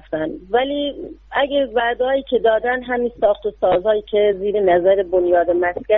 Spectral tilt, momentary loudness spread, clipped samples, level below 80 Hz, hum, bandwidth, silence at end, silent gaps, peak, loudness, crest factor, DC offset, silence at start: -8.5 dB/octave; 7 LU; under 0.1%; -46 dBFS; none; 4.1 kHz; 0 s; none; -2 dBFS; -18 LUFS; 14 dB; under 0.1%; 0.1 s